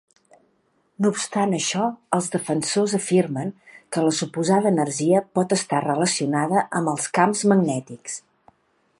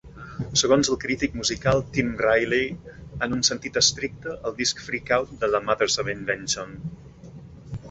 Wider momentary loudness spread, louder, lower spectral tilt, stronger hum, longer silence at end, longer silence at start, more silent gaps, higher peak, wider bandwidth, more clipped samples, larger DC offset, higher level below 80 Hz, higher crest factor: second, 9 LU vs 18 LU; about the same, -22 LUFS vs -23 LUFS; first, -4.5 dB/octave vs -3 dB/octave; neither; first, 0.8 s vs 0 s; first, 1 s vs 0.05 s; neither; about the same, -2 dBFS vs -4 dBFS; first, 11.5 kHz vs 8.2 kHz; neither; neither; second, -70 dBFS vs -48 dBFS; about the same, 20 dB vs 20 dB